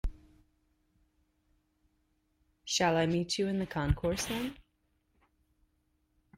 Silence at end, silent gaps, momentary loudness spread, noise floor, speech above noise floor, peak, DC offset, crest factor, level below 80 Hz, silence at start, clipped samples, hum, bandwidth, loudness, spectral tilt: 1.85 s; none; 12 LU; -76 dBFS; 45 dB; -16 dBFS; under 0.1%; 20 dB; -46 dBFS; 0.05 s; under 0.1%; none; 16 kHz; -32 LUFS; -4.5 dB/octave